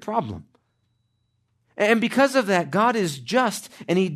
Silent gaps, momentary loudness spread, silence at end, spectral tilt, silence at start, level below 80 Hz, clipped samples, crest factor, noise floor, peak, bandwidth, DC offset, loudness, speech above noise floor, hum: none; 15 LU; 0 s; -5 dB/octave; 0 s; -68 dBFS; under 0.1%; 18 dB; -70 dBFS; -6 dBFS; 13.5 kHz; under 0.1%; -22 LUFS; 49 dB; none